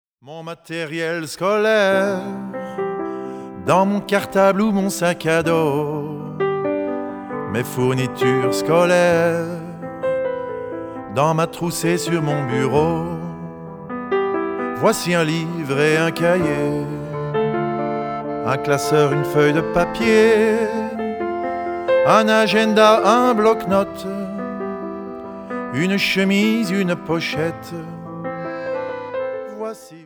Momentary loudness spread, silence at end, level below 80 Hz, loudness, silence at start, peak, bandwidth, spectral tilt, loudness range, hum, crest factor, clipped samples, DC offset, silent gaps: 15 LU; 0 s; -52 dBFS; -19 LUFS; 0.25 s; 0 dBFS; over 20 kHz; -5.5 dB/octave; 5 LU; none; 18 dB; under 0.1%; under 0.1%; none